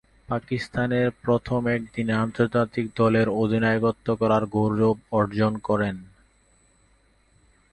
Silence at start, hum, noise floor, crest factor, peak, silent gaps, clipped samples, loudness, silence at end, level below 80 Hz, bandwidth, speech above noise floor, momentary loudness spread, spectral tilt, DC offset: 0.3 s; none; -61 dBFS; 18 dB; -8 dBFS; none; under 0.1%; -24 LUFS; 1.65 s; -52 dBFS; 9.4 kHz; 38 dB; 6 LU; -8 dB/octave; under 0.1%